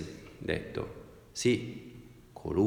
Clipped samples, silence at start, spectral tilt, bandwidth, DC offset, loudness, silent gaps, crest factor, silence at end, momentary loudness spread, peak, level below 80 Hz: under 0.1%; 0 s; -5.5 dB/octave; 16.5 kHz; under 0.1%; -35 LUFS; none; 18 dB; 0 s; 21 LU; -16 dBFS; -54 dBFS